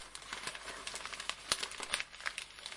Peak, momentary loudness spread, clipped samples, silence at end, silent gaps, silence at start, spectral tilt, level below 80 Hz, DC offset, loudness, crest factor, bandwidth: -8 dBFS; 7 LU; under 0.1%; 0 s; none; 0 s; 0.5 dB/octave; -66 dBFS; under 0.1%; -40 LUFS; 36 dB; 11.5 kHz